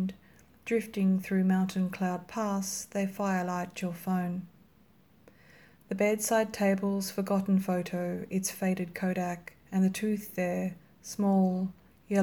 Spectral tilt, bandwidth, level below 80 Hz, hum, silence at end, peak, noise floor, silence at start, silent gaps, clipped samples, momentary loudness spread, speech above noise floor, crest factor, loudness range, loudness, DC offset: -6 dB/octave; 19 kHz; -68 dBFS; none; 0 s; -16 dBFS; -62 dBFS; 0 s; none; under 0.1%; 9 LU; 33 dB; 16 dB; 4 LU; -31 LUFS; under 0.1%